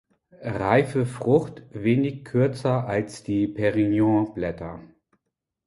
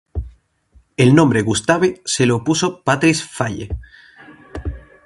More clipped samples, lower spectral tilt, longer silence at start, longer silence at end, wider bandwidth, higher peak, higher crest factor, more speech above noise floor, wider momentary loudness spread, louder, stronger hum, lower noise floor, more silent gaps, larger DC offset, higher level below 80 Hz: neither; first, -8 dB/octave vs -5 dB/octave; first, 0.4 s vs 0.15 s; first, 0.8 s vs 0.25 s; about the same, 11.5 kHz vs 11.5 kHz; second, -4 dBFS vs 0 dBFS; about the same, 20 dB vs 18 dB; first, 58 dB vs 38 dB; second, 13 LU vs 18 LU; second, -24 LUFS vs -16 LUFS; neither; first, -81 dBFS vs -54 dBFS; neither; neither; second, -52 dBFS vs -36 dBFS